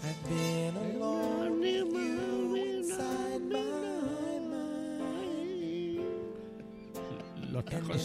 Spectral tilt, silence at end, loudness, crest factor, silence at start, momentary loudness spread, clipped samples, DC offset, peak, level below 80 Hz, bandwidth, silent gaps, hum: -5.5 dB/octave; 0 s; -35 LUFS; 14 dB; 0 s; 11 LU; under 0.1%; under 0.1%; -20 dBFS; -64 dBFS; 15.5 kHz; none; none